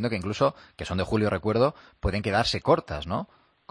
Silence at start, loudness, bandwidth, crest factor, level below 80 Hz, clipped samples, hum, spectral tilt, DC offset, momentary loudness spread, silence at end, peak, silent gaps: 0 s; -26 LUFS; 10.5 kHz; 18 dB; -44 dBFS; under 0.1%; none; -6 dB/octave; under 0.1%; 9 LU; 0.45 s; -8 dBFS; none